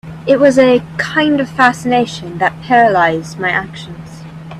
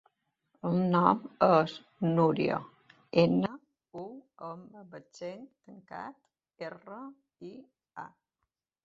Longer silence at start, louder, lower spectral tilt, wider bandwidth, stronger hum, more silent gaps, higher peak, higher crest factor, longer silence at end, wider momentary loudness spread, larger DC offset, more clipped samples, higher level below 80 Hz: second, 0.05 s vs 0.65 s; first, -13 LUFS vs -28 LUFS; second, -5.5 dB/octave vs -8 dB/octave; first, 13 kHz vs 7.6 kHz; neither; neither; first, 0 dBFS vs -8 dBFS; second, 14 dB vs 24 dB; second, 0 s vs 0.8 s; second, 20 LU vs 24 LU; neither; neither; first, -48 dBFS vs -70 dBFS